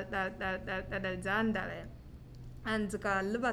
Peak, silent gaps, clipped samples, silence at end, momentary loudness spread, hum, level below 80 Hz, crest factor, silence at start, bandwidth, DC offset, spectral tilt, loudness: -20 dBFS; none; under 0.1%; 0 s; 19 LU; none; -52 dBFS; 16 dB; 0 s; 14.5 kHz; under 0.1%; -5.5 dB/octave; -35 LUFS